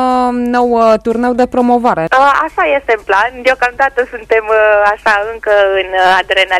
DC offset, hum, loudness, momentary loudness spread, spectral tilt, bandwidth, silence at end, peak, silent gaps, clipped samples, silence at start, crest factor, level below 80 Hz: under 0.1%; none; -11 LUFS; 4 LU; -4.5 dB/octave; 13.5 kHz; 0 s; 0 dBFS; none; under 0.1%; 0 s; 10 dB; -42 dBFS